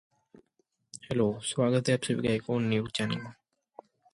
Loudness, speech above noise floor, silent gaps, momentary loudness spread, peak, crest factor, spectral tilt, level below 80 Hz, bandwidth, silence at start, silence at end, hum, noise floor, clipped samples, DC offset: -29 LUFS; 47 dB; none; 14 LU; -12 dBFS; 20 dB; -5.5 dB/octave; -62 dBFS; 11.5 kHz; 0.95 s; 0.8 s; none; -75 dBFS; under 0.1%; under 0.1%